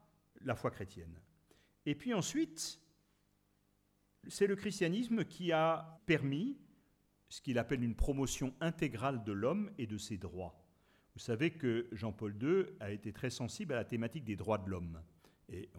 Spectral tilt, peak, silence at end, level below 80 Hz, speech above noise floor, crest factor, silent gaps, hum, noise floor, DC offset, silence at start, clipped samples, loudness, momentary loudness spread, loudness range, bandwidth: -5.5 dB/octave; -18 dBFS; 0 s; -54 dBFS; 38 dB; 20 dB; none; 50 Hz at -65 dBFS; -76 dBFS; under 0.1%; 0.4 s; under 0.1%; -38 LUFS; 14 LU; 5 LU; 16.5 kHz